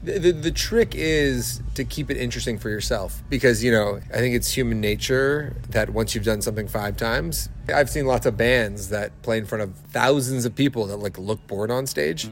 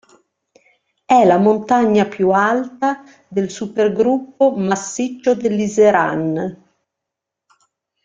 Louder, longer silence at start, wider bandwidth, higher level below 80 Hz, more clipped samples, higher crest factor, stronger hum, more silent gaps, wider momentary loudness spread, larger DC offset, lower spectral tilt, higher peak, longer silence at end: second, -23 LUFS vs -16 LUFS; second, 0 s vs 1.1 s; first, 16.5 kHz vs 9.2 kHz; first, -36 dBFS vs -60 dBFS; neither; about the same, 18 dB vs 16 dB; neither; neither; about the same, 8 LU vs 10 LU; neither; second, -4.5 dB/octave vs -6 dB/octave; about the same, -4 dBFS vs -2 dBFS; second, 0 s vs 1.5 s